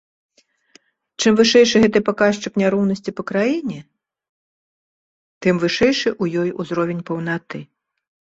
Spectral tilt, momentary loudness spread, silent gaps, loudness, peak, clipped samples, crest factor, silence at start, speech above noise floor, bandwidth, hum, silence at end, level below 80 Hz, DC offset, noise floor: -5 dB/octave; 13 LU; 4.29-5.41 s; -18 LUFS; -2 dBFS; under 0.1%; 18 dB; 1.2 s; 37 dB; 8 kHz; none; 0.75 s; -54 dBFS; under 0.1%; -55 dBFS